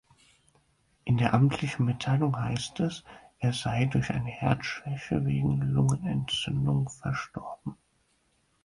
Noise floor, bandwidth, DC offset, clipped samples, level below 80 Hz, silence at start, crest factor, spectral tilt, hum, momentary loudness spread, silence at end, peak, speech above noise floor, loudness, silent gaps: -71 dBFS; 11 kHz; under 0.1%; under 0.1%; -52 dBFS; 1.05 s; 20 dB; -6 dB/octave; none; 11 LU; 0.9 s; -8 dBFS; 43 dB; -29 LUFS; none